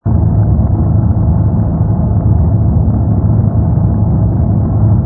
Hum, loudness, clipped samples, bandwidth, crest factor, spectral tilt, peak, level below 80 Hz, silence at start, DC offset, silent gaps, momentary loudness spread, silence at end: none; -12 LUFS; under 0.1%; 1.8 kHz; 10 dB; -15.5 dB/octave; 0 dBFS; -18 dBFS; 0.05 s; under 0.1%; none; 1 LU; 0 s